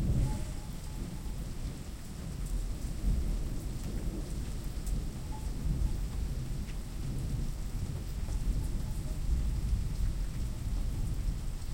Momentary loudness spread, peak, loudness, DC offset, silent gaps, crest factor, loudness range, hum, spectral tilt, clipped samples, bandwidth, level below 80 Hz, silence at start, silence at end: 7 LU; -18 dBFS; -38 LUFS; under 0.1%; none; 16 dB; 2 LU; none; -6 dB/octave; under 0.1%; 16.5 kHz; -34 dBFS; 0 s; 0 s